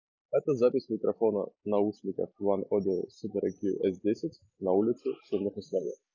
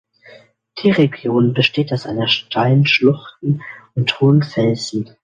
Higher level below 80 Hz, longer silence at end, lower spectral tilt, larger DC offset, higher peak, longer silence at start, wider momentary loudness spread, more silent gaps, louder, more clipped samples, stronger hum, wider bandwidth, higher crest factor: second, -68 dBFS vs -58 dBFS; about the same, 0.2 s vs 0.2 s; first, -8.5 dB/octave vs -6.5 dB/octave; neither; second, -14 dBFS vs -2 dBFS; second, 0.3 s vs 0.75 s; about the same, 7 LU vs 9 LU; neither; second, -31 LUFS vs -16 LUFS; neither; neither; second, 7.2 kHz vs 9.2 kHz; about the same, 16 dB vs 16 dB